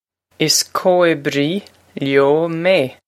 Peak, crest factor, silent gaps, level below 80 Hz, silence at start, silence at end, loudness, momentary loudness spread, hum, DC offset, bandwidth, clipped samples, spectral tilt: 0 dBFS; 16 dB; none; -64 dBFS; 0.4 s; 0.15 s; -16 LUFS; 9 LU; none; under 0.1%; 16 kHz; under 0.1%; -3.5 dB/octave